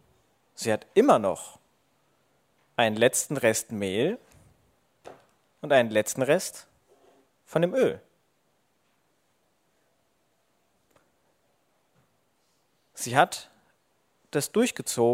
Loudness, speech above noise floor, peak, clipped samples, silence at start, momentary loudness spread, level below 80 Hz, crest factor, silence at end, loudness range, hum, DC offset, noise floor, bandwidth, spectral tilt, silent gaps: -26 LUFS; 47 dB; -2 dBFS; under 0.1%; 0.6 s; 16 LU; -74 dBFS; 26 dB; 0 s; 6 LU; none; under 0.1%; -71 dBFS; 16 kHz; -4 dB/octave; none